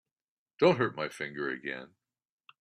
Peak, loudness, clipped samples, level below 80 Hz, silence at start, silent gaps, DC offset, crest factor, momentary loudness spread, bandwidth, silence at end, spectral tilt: -10 dBFS; -31 LUFS; under 0.1%; -72 dBFS; 0.6 s; none; under 0.1%; 22 dB; 13 LU; 11.5 kHz; 0.75 s; -6 dB/octave